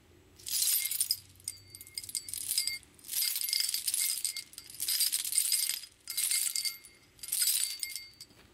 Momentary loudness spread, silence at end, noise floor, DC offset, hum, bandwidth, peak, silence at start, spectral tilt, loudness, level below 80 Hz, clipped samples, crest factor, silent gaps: 15 LU; 0.1 s; -55 dBFS; under 0.1%; none; 16.5 kHz; -12 dBFS; 0.4 s; 3 dB/octave; -30 LUFS; -72 dBFS; under 0.1%; 22 dB; none